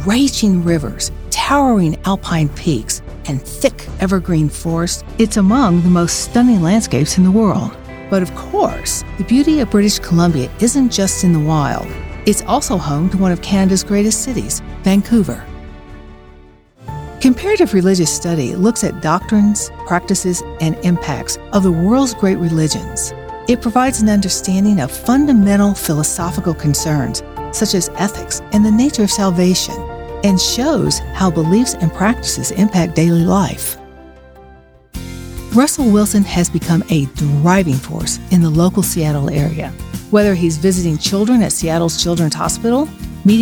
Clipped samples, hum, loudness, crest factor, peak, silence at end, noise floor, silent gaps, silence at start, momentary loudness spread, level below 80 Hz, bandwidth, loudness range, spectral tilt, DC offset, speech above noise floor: under 0.1%; none; -15 LUFS; 14 dB; 0 dBFS; 0 s; -43 dBFS; none; 0 s; 9 LU; -32 dBFS; over 20 kHz; 3 LU; -5 dB/octave; under 0.1%; 29 dB